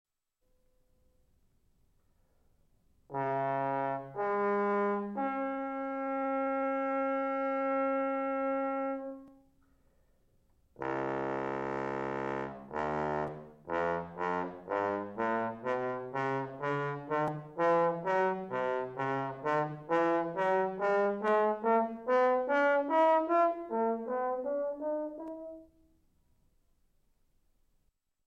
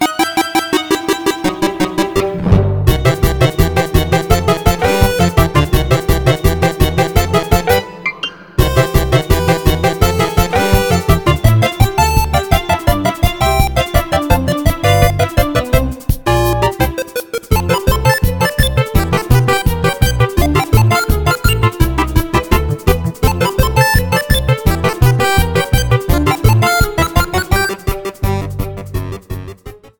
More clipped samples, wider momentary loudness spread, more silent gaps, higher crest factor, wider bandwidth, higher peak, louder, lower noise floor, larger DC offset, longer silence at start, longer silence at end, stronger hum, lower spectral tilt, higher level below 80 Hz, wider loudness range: second, under 0.1% vs 0.1%; first, 9 LU vs 6 LU; neither; about the same, 16 dB vs 12 dB; second, 7.8 kHz vs over 20 kHz; second, -18 dBFS vs 0 dBFS; second, -32 LUFS vs -14 LUFS; first, -76 dBFS vs -33 dBFS; neither; first, 3.1 s vs 0 s; first, 2.65 s vs 0.25 s; neither; first, -7.5 dB/octave vs -5.5 dB/octave; second, -68 dBFS vs -20 dBFS; first, 10 LU vs 2 LU